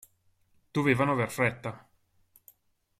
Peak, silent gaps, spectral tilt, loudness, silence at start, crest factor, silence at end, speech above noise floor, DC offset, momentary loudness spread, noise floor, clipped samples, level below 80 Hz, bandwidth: -10 dBFS; none; -6.5 dB/octave; -28 LUFS; 0.75 s; 22 dB; 1.2 s; 40 dB; under 0.1%; 15 LU; -68 dBFS; under 0.1%; -64 dBFS; 15.5 kHz